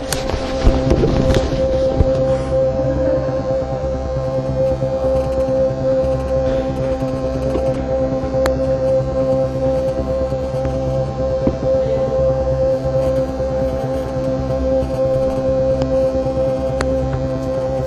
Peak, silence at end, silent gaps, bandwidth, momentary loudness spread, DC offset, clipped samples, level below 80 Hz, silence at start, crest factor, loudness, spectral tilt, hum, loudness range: 0 dBFS; 0 s; none; 13 kHz; 4 LU; under 0.1%; under 0.1%; -26 dBFS; 0 s; 16 dB; -18 LUFS; -7.5 dB/octave; none; 2 LU